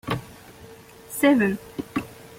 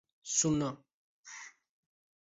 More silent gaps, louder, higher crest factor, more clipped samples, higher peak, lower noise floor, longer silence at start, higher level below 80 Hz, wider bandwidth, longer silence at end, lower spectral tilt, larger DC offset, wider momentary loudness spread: second, none vs 0.93-1.24 s; first, -24 LUFS vs -32 LUFS; about the same, 18 dB vs 22 dB; neither; first, -8 dBFS vs -16 dBFS; second, -46 dBFS vs -52 dBFS; second, 0.05 s vs 0.25 s; first, -56 dBFS vs -66 dBFS; first, 16.5 kHz vs 8 kHz; second, 0.05 s vs 0.75 s; first, -5.5 dB/octave vs -3.5 dB/octave; neither; first, 26 LU vs 22 LU